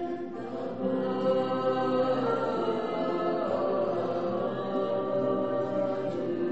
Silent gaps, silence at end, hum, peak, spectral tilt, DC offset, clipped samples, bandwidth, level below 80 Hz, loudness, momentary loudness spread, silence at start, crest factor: none; 0 s; none; -16 dBFS; -5.5 dB/octave; 0.4%; under 0.1%; 8 kHz; -68 dBFS; -29 LUFS; 4 LU; 0 s; 14 dB